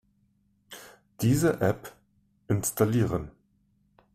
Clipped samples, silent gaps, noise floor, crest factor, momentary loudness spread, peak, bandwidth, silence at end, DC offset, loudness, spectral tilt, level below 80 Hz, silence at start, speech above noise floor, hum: under 0.1%; none; -69 dBFS; 18 dB; 22 LU; -12 dBFS; 16 kHz; 0.85 s; under 0.1%; -27 LUFS; -6 dB/octave; -54 dBFS; 0.7 s; 43 dB; 50 Hz at -55 dBFS